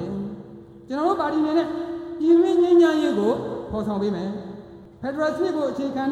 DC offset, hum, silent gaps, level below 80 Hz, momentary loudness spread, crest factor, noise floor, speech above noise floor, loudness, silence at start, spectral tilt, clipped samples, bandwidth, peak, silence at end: under 0.1%; none; none; -54 dBFS; 17 LU; 14 dB; -42 dBFS; 21 dB; -22 LUFS; 0 s; -7 dB/octave; under 0.1%; 8.4 kHz; -8 dBFS; 0 s